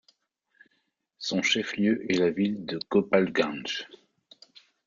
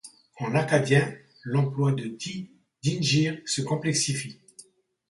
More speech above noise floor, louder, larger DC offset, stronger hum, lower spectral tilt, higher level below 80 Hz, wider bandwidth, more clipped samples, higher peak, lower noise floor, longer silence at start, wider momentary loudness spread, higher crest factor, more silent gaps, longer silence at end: first, 49 dB vs 29 dB; about the same, -27 LUFS vs -26 LUFS; neither; neither; about the same, -4.5 dB/octave vs -4.5 dB/octave; about the same, -68 dBFS vs -64 dBFS; second, 7.4 kHz vs 11.5 kHz; neither; about the same, -8 dBFS vs -8 dBFS; first, -75 dBFS vs -54 dBFS; first, 1.2 s vs 0.05 s; about the same, 10 LU vs 12 LU; about the same, 20 dB vs 20 dB; neither; first, 1 s vs 0.5 s